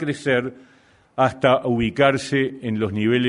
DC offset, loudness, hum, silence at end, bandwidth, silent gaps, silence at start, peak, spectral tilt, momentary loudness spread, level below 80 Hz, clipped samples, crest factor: under 0.1%; -20 LUFS; none; 0 s; 11 kHz; none; 0 s; -2 dBFS; -6 dB/octave; 7 LU; -52 dBFS; under 0.1%; 20 dB